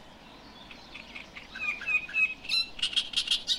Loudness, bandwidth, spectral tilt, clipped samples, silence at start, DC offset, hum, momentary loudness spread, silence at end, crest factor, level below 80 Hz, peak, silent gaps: -28 LUFS; 16 kHz; 0.5 dB/octave; under 0.1%; 0 s; under 0.1%; none; 21 LU; 0 s; 18 dB; -58 dBFS; -14 dBFS; none